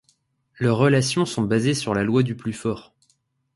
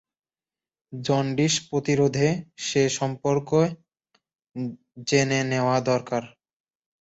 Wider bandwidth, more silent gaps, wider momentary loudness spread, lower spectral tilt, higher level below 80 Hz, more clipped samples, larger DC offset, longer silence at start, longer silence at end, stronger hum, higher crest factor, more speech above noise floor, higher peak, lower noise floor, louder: first, 11.5 kHz vs 8.2 kHz; neither; about the same, 10 LU vs 12 LU; about the same, -5.5 dB/octave vs -5 dB/octave; first, -54 dBFS vs -62 dBFS; neither; neither; second, 0.6 s vs 0.9 s; about the same, 0.75 s vs 0.75 s; neither; about the same, 18 dB vs 18 dB; second, 47 dB vs over 66 dB; about the same, -6 dBFS vs -6 dBFS; second, -68 dBFS vs under -90 dBFS; about the same, -22 LUFS vs -24 LUFS